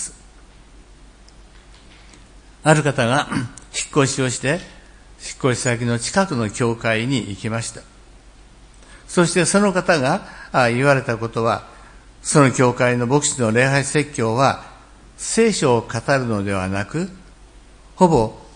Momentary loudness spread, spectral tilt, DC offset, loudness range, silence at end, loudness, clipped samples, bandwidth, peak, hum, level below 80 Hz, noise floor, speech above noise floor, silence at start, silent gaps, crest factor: 10 LU; -4.5 dB/octave; under 0.1%; 5 LU; 0.05 s; -19 LUFS; under 0.1%; 10.5 kHz; 0 dBFS; none; -46 dBFS; -45 dBFS; 27 dB; 0 s; none; 20 dB